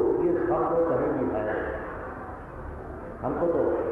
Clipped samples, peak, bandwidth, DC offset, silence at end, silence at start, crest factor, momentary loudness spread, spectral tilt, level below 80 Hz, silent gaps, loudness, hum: under 0.1%; -14 dBFS; 3.6 kHz; under 0.1%; 0 s; 0 s; 14 dB; 15 LU; -10 dB/octave; -46 dBFS; none; -27 LUFS; none